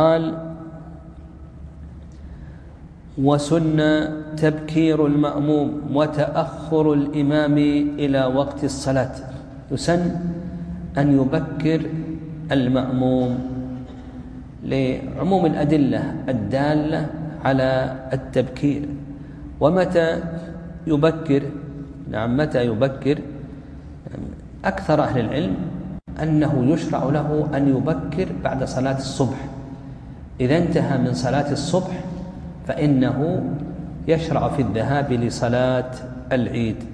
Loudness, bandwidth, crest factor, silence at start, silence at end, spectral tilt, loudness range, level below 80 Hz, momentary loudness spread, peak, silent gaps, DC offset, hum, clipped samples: -21 LUFS; 10.5 kHz; 18 dB; 0 s; 0 s; -7.5 dB/octave; 4 LU; -42 dBFS; 18 LU; -2 dBFS; none; under 0.1%; none; under 0.1%